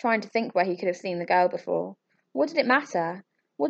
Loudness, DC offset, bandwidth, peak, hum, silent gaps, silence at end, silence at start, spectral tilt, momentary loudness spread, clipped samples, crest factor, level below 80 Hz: -26 LUFS; under 0.1%; 7.8 kHz; -8 dBFS; none; none; 0 s; 0.05 s; -5.5 dB/octave; 10 LU; under 0.1%; 18 dB; -86 dBFS